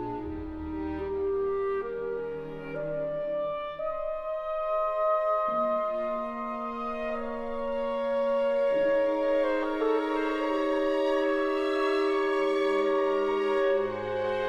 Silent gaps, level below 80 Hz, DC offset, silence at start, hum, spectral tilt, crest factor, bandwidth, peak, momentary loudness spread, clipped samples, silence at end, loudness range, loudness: none; -52 dBFS; under 0.1%; 0 s; none; -6 dB/octave; 12 dB; 9.4 kHz; -16 dBFS; 8 LU; under 0.1%; 0 s; 5 LU; -29 LUFS